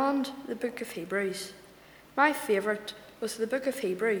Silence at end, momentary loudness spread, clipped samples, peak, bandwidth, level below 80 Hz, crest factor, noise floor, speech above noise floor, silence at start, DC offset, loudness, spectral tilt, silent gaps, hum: 0 s; 12 LU; under 0.1%; -8 dBFS; over 20 kHz; -70 dBFS; 22 dB; -54 dBFS; 24 dB; 0 s; under 0.1%; -31 LUFS; -4 dB/octave; none; none